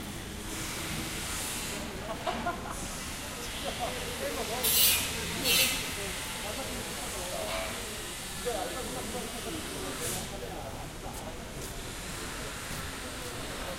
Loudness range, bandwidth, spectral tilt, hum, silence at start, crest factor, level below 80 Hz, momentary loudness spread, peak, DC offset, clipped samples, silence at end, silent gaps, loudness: 10 LU; 16 kHz; -2 dB/octave; none; 0 s; 24 dB; -46 dBFS; 14 LU; -10 dBFS; under 0.1%; under 0.1%; 0 s; none; -32 LUFS